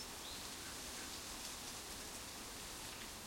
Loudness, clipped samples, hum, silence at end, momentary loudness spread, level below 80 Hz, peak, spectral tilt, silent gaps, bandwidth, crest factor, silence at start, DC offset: -47 LUFS; under 0.1%; none; 0 s; 2 LU; -64 dBFS; -34 dBFS; -1.5 dB/octave; none; 16.5 kHz; 16 dB; 0 s; under 0.1%